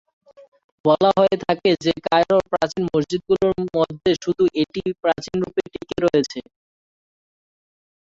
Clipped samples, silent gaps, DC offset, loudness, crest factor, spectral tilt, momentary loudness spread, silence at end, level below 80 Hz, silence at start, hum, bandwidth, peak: under 0.1%; none; under 0.1%; -20 LUFS; 18 dB; -6 dB/octave; 7 LU; 1.6 s; -52 dBFS; 0.85 s; none; 7.8 kHz; -4 dBFS